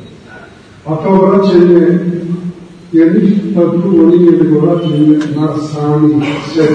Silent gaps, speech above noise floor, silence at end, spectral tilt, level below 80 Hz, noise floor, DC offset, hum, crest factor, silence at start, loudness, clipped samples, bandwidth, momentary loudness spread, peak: none; 26 dB; 0 s; -8.5 dB/octave; -48 dBFS; -35 dBFS; under 0.1%; none; 10 dB; 0 s; -10 LUFS; 0.5%; 8 kHz; 11 LU; 0 dBFS